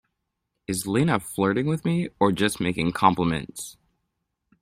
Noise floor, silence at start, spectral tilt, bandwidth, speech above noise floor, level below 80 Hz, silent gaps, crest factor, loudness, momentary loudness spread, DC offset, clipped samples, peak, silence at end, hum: -80 dBFS; 0.7 s; -5.5 dB/octave; 16 kHz; 56 dB; -54 dBFS; none; 22 dB; -24 LUFS; 13 LU; under 0.1%; under 0.1%; -4 dBFS; 0.9 s; none